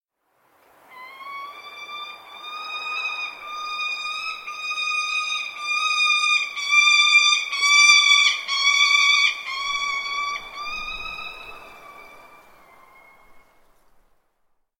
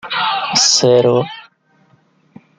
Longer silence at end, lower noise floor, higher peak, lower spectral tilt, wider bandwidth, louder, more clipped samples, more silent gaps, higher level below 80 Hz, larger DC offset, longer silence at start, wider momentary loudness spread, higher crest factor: first, 1.4 s vs 1.2 s; first, -67 dBFS vs -55 dBFS; about the same, -2 dBFS vs 0 dBFS; second, 4 dB/octave vs -2.5 dB/octave; first, 16.5 kHz vs 10 kHz; second, -18 LUFS vs -12 LUFS; neither; neither; about the same, -58 dBFS vs -62 dBFS; neither; first, 0.9 s vs 0.05 s; first, 22 LU vs 14 LU; first, 22 dB vs 16 dB